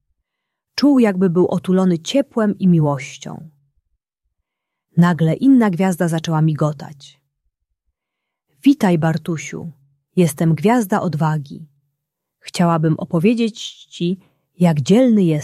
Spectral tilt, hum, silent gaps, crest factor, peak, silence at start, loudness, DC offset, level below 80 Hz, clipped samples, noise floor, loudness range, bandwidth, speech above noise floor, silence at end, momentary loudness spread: -7 dB/octave; none; none; 16 dB; -2 dBFS; 0.75 s; -17 LUFS; under 0.1%; -60 dBFS; under 0.1%; -80 dBFS; 4 LU; 14 kHz; 64 dB; 0 s; 16 LU